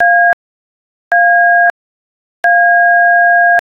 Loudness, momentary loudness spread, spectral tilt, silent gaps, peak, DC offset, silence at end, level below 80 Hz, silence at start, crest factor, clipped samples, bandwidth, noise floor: -9 LUFS; 7 LU; -2.5 dB/octave; 0.33-1.11 s, 1.70-2.43 s; -2 dBFS; under 0.1%; 0.1 s; -66 dBFS; 0 s; 8 dB; under 0.1%; 5.8 kHz; under -90 dBFS